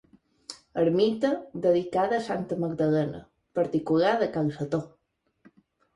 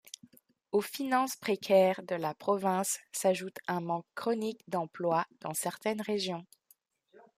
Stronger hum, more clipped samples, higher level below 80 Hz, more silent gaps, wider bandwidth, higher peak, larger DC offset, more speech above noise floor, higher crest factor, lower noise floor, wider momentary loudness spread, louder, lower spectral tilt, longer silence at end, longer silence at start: neither; neither; first, -64 dBFS vs -80 dBFS; neither; second, 11.5 kHz vs 15.5 kHz; about the same, -10 dBFS vs -12 dBFS; neither; first, 42 dB vs 37 dB; about the same, 16 dB vs 20 dB; about the same, -67 dBFS vs -69 dBFS; first, 15 LU vs 9 LU; first, -27 LUFS vs -32 LUFS; first, -7 dB/octave vs -4 dB/octave; first, 1.1 s vs 0.95 s; second, 0.5 s vs 0.75 s